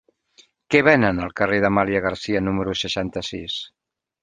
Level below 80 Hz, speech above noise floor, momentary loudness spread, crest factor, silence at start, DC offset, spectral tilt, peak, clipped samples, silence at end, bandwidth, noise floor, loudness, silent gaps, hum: -46 dBFS; 36 dB; 13 LU; 20 dB; 0.7 s; under 0.1%; -5.5 dB/octave; -2 dBFS; under 0.1%; 0.55 s; 9.6 kHz; -56 dBFS; -21 LUFS; none; none